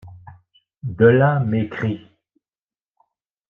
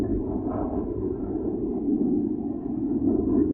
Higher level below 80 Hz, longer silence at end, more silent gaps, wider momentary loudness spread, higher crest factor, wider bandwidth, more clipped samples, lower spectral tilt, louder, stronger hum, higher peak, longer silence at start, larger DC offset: second, -56 dBFS vs -40 dBFS; first, 1.5 s vs 0 s; first, 0.77-0.81 s vs none; first, 19 LU vs 6 LU; first, 20 dB vs 14 dB; first, 3.9 kHz vs 2 kHz; neither; second, -10 dB/octave vs -13.5 dB/octave; first, -18 LUFS vs -27 LUFS; neither; first, -2 dBFS vs -12 dBFS; about the same, 0.05 s vs 0 s; neither